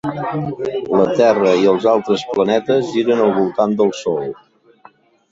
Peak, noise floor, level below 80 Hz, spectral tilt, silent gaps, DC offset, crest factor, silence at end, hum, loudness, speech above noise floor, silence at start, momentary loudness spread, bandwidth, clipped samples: -2 dBFS; -48 dBFS; -56 dBFS; -6.5 dB/octave; none; under 0.1%; 14 dB; 1 s; none; -16 LUFS; 33 dB; 0.05 s; 9 LU; 7.8 kHz; under 0.1%